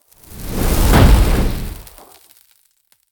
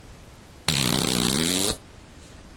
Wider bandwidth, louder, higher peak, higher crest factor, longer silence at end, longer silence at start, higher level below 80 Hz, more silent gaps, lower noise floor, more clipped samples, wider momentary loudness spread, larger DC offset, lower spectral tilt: about the same, over 20 kHz vs 19 kHz; first, -15 LUFS vs -23 LUFS; first, 0 dBFS vs -4 dBFS; second, 16 dB vs 22 dB; first, 1.3 s vs 0 s; first, 0.3 s vs 0.05 s; first, -18 dBFS vs -46 dBFS; neither; first, -59 dBFS vs -47 dBFS; neither; first, 21 LU vs 7 LU; neither; first, -5.5 dB/octave vs -3 dB/octave